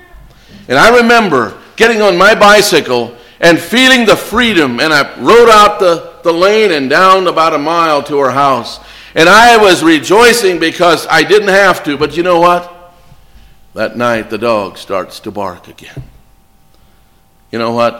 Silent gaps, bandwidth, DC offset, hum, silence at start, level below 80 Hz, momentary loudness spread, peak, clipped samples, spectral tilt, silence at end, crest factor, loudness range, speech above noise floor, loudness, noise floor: none; 17 kHz; under 0.1%; none; 0.55 s; -40 dBFS; 14 LU; 0 dBFS; 0.3%; -3.5 dB/octave; 0 s; 10 dB; 11 LU; 38 dB; -8 LUFS; -47 dBFS